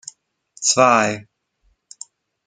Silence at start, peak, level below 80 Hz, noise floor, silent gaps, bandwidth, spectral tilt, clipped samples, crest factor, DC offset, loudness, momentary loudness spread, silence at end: 0.6 s; -2 dBFS; -66 dBFS; -65 dBFS; none; 9.6 kHz; -2.5 dB/octave; under 0.1%; 20 dB; under 0.1%; -16 LUFS; 25 LU; 1.25 s